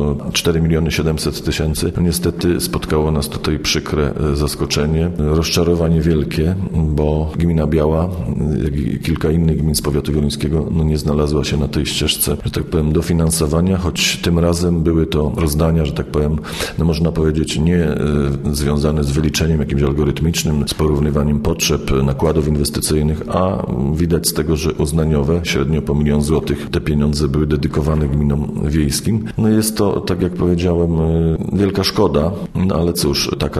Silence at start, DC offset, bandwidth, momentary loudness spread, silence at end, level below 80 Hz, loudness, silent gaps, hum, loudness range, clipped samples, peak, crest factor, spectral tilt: 0 s; under 0.1%; 13.5 kHz; 3 LU; 0 s; -26 dBFS; -17 LUFS; none; none; 1 LU; under 0.1%; -2 dBFS; 14 dB; -5.5 dB/octave